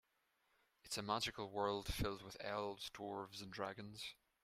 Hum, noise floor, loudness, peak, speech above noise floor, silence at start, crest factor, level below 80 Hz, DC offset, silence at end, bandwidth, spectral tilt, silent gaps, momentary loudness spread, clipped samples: none; -82 dBFS; -45 LUFS; -24 dBFS; 37 dB; 0.85 s; 24 dB; -60 dBFS; under 0.1%; 0.3 s; 16 kHz; -4 dB/octave; none; 9 LU; under 0.1%